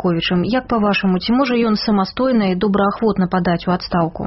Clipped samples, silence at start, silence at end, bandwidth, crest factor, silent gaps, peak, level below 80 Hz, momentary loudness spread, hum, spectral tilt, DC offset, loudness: under 0.1%; 0 s; 0 s; 6 kHz; 12 dB; none; -6 dBFS; -42 dBFS; 2 LU; none; -5 dB/octave; 0.1%; -17 LUFS